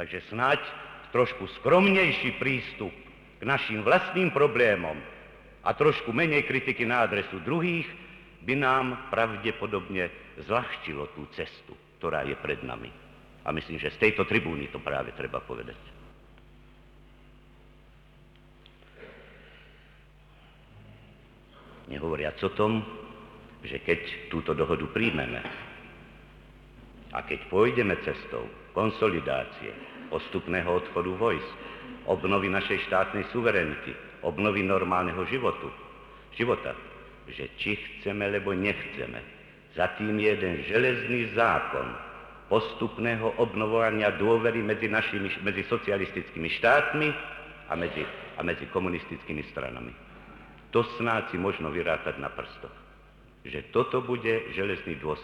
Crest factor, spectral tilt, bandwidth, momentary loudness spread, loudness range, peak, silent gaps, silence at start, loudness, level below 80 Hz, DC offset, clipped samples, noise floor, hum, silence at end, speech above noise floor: 20 dB; -7 dB/octave; 11 kHz; 17 LU; 8 LU; -10 dBFS; none; 0 s; -28 LUFS; -54 dBFS; under 0.1%; under 0.1%; -55 dBFS; none; 0 s; 27 dB